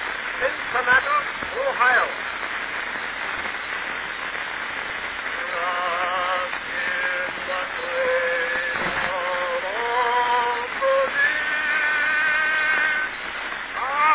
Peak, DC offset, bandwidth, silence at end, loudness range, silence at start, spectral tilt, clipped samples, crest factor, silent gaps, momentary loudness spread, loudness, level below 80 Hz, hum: -6 dBFS; under 0.1%; 4 kHz; 0 s; 6 LU; 0 s; -5.5 dB/octave; under 0.1%; 18 dB; none; 8 LU; -22 LUFS; -54 dBFS; none